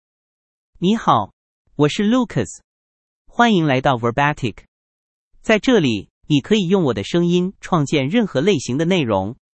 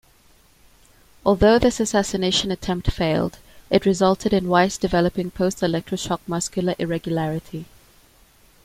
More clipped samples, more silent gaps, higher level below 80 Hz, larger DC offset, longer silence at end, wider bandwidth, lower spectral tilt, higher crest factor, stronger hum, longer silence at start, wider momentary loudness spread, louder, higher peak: neither; first, 1.33-1.65 s, 2.64-3.25 s, 4.68-5.31 s, 6.10-6.21 s vs none; second, -50 dBFS vs -40 dBFS; neither; second, 0.25 s vs 1 s; second, 8.8 kHz vs 16 kHz; about the same, -6 dB/octave vs -5 dB/octave; about the same, 18 dB vs 20 dB; neither; second, 0.8 s vs 1.25 s; about the same, 10 LU vs 8 LU; first, -18 LUFS vs -21 LUFS; about the same, 0 dBFS vs -2 dBFS